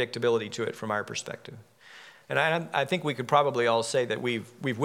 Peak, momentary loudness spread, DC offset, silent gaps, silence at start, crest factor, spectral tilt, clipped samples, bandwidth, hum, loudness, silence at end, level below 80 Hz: -8 dBFS; 17 LU; under 0.1%; none; 0 s; 20 dB; -4.5 dB/octave; under 0.1%; 16 kHz; none; -28 LUFS; 0 s; -80 dBFS